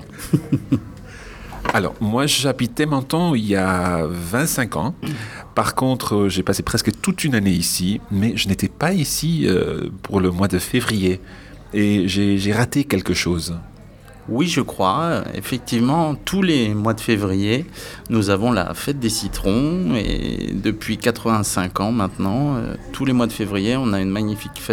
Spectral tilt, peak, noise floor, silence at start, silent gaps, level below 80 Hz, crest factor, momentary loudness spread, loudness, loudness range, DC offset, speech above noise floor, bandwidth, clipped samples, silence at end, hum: -5 dB/octave; -2 dBFS; -42 dBFS; 0 s; none; -40 dBFS; 18 dB; 7 LU; -20 LUFS; 2 LU; under 0.1%; 22 dB; 19 kHz; under 0.1%; 0 s; none